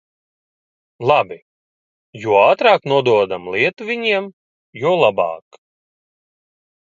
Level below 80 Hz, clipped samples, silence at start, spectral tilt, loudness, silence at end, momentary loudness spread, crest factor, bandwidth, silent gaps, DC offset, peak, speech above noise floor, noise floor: -62 dBFS; under 0.1%; 1 s; -6 dB/octave; -16 LUFS; 1.45 s; 11 LU; 18 dB; 7.6 kHz; 1.42-2.13 s, 4.33-4.73 s; under 0.1%; 0 dBFS; over 74 dB; under -90 dBFS